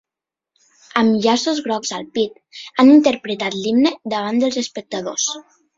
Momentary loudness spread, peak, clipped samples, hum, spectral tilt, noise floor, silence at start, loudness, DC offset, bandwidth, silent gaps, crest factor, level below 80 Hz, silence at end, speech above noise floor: 13 LU; 0 dBFS; under 0.1%; none; -3.5 dB/octave; -87 dBFS; 0.95 s; -18 LUFS; under 0.1%; 7.8 kHz; none; 18 dB; -62 dBFS; 0.35 s; 70 dB